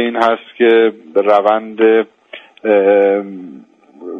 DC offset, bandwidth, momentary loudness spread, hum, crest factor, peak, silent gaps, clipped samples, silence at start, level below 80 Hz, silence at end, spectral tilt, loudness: under 0.1%; 6.2 kHz; 14 LU; none; 14 dB; 0 dBFS; none; under 0.1%; 0 s; -64 dBFS; 0 s; -6.5 dB/octave; -13 LUFS